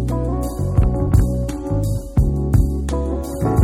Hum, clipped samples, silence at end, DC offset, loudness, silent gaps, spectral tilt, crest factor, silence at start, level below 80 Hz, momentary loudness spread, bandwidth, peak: none; under 0.1%; 0 s; under 0.1%; -20 LUFS; none; -8.5 dB/octave; 16 dB; 0 s; -22 dBFS; 5 LU; 16 kHz; -2 dBFS